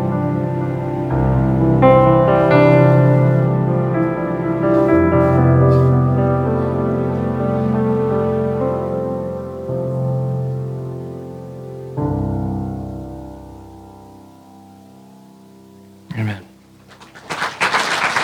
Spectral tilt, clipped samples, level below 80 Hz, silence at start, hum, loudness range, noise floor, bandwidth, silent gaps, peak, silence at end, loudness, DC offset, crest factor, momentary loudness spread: -7.5 dB/octave; under 0.1%; -38 dBFS; 0 s; none; 19 LU; -45 dBFS; 10 kHz; none; 0 dBFS; 0 s; -16 LUFS; under 0.1%; 16 dB; 18 LU